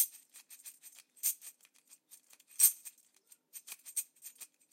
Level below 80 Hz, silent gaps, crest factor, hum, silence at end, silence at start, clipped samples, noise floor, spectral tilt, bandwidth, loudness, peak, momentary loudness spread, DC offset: under -90 dBFS; none; 28 dB; none; 0.3 s; 0 s; under 0.1%; -67 dBFS; 5.5 dB/octave; 16.5 kHz; -31 LUFS; -12 dBFS; 27 LU; under 0.1%